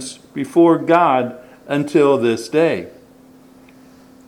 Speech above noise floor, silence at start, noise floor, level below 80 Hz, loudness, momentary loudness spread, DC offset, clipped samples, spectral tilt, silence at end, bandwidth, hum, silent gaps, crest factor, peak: 31 dB; 0 s; -46 dBFS; -64 dBFS; -16 LUFS; 14 LU; under 0.1%; under 0.1%; -6 dB/octave; 1.4 s; 12.5 kHz; none; none; 18 dB; 0 dBFS